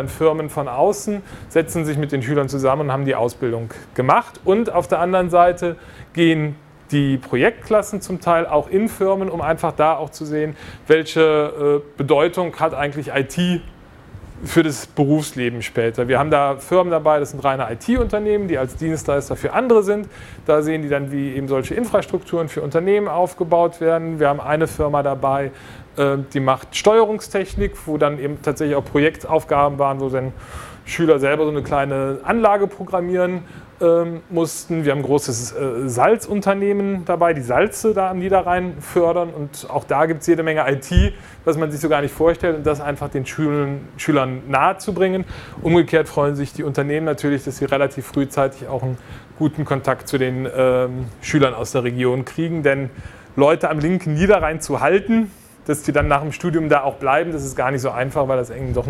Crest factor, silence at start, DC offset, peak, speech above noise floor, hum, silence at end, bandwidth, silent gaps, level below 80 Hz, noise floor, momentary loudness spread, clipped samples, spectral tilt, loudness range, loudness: 18 dB; 0 s; under 0.1%; 0 dBFS; 22 dB; none; 0 s; 16 kHz; none; -38 dBFS; -40 dBFS; 8 LU; under 0.1%; -6 dB/octave; 2 LU; -19 LUFS